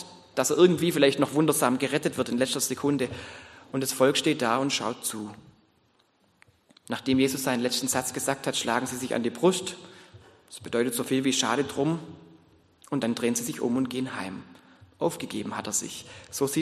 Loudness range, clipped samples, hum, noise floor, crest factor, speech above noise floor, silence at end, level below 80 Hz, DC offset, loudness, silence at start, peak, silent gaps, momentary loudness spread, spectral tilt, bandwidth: 5 LU; under 0.1%; none; -66 dBFS; 22 dB; 40 dB; 0 s; -68 dBFS; under 0.1%; -26 LUFS; 0 s; -6 dBFS; none; 15 LU; -4 dB/octave; 13 kHz